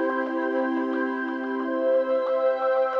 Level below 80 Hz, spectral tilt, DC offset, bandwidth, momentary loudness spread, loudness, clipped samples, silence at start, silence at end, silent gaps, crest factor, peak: -80 dBFS; -5.5 dB/octave; under 0.1%; 5.6 kHz; 5 LU; -25 LUFS; under 0.1%; 0 s; 0 s; none; 10 dB; -14 dBFS